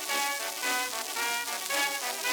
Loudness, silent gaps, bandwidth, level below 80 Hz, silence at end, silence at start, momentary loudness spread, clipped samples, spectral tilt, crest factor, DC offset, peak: -29 LUFS; none; over 20 kHz; -84 dBFS; 0 s; 0 s; 2 LU; under 0.1%; 2 dB/octave; 20 dB; under 0.1%; -10 dBFS